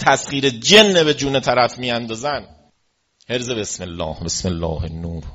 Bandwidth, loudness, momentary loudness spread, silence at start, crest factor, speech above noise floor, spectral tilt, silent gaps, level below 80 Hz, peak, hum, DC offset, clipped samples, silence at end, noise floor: 8.2 kHz; -17 LUFS; 16 LU; 0 s; 18 dB; 48 dB; -3.5 dB/octave; none; -40 dBFS; 0 dBFS; none; under 0.1%; under 0.1%; 0 s; -66 dBFS